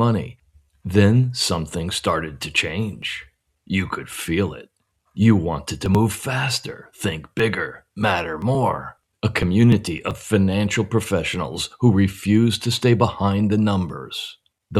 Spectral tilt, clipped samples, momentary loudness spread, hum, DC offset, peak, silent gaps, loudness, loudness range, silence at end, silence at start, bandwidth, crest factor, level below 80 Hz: -5.5 dB/octave; under 0.1%; 12 LU; none; under 0.1%; -2 dBFS; none; -21 LUFS; 4 LU; 0 s; 0 s; 13.5 kHz; 18 dB; -48 dBFS